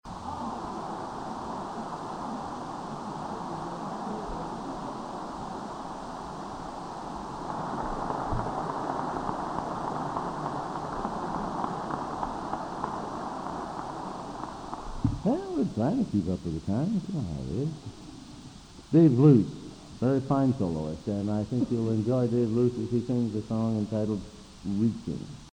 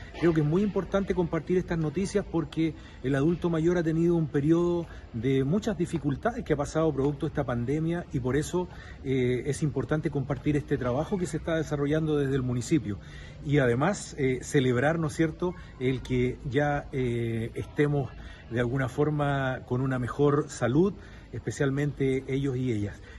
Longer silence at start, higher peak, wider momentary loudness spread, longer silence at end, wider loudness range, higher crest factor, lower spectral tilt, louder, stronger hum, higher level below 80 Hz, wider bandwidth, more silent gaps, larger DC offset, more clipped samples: about the same, 0.05 s vs 0 s; first, -8 dBFS vs -12 dBFS; first, 12 LU vs 7 LU; about the same, 0 s vs 0 s; first, 11 LU vs 2 LU; first, 22 dB vs 16 dB; about the same, -8 dB/octave vs -7 dB/octave; about the same, -30 LUFS vs -28 LUFS; neither; about the same, -50 dBFS vs -46 dBFS; second, 10 kHz vs 12 kHz; neither; neither; neither